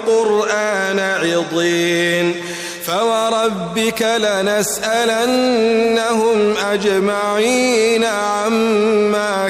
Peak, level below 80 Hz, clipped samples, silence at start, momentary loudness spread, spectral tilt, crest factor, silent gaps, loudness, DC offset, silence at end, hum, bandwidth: -6 dBFS; -54 dBFS; under 0.1%; 0 s; 3 LU; -3.5 dB/octave; 10 dB; none; -16 LUFS; under 0.1%; 0 s; none; 16 kHz